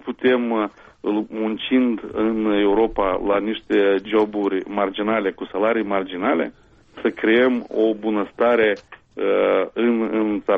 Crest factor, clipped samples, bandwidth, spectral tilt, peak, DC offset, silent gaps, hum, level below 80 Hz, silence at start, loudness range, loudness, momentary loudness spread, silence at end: 14 dB; under 0.1%; 5.4 kHz; -7.5 dB/octave; -6 dBFS; under 0.1%; none; none; -50 dBFS; 0.05 s; 2 LU; -21 LUFS; 7 LU; 0 s